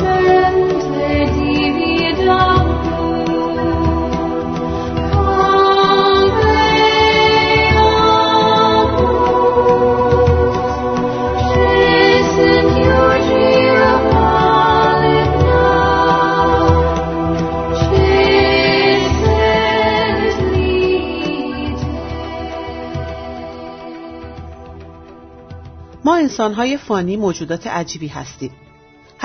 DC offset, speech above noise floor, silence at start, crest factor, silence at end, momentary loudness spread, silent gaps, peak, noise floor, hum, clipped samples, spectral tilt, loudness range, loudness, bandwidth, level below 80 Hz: under 0.1%; 25 dB; 0 s; 14 dB; 0 s; 14 LU; none; 0 dBFS; -46 dBFS; none; under 0.1%; -6 dB/octave; 11 LU; -13 LUFS; 6.6 kHz; -28 dBFS